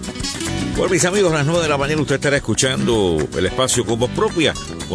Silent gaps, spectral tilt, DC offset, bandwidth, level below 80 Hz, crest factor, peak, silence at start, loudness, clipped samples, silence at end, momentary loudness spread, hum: none; -4 dB/octave; under 0.1%; 11 kHz; -36 dBFS; 16 dB; -2 dBFS; 0 s; -18 LUFS; under 0.1%; 0 s; 6 LU; none